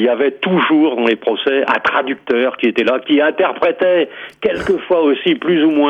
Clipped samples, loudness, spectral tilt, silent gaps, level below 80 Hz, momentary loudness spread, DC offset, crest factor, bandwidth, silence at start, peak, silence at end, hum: under 0.1%; -15 LUFS; -6.5 dB/octave; none; -52 dBFS; 5 LU; under 0.1%; 12 dB; 8.2 kHz; 0 s; -2 dBFS; 0 s; none